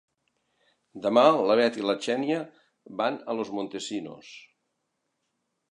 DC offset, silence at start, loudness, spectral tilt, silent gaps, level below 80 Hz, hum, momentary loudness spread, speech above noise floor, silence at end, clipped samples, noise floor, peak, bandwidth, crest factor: under 0.1%; 0.95 s; -26 LUFS; -4.5 dB/octave; none; -78 dBFS; none; 21 LU; 53 dB; 1.3 s; under 0.1%; -79 dBFS; -4 dBFS; 10.5 kHz; 24 dB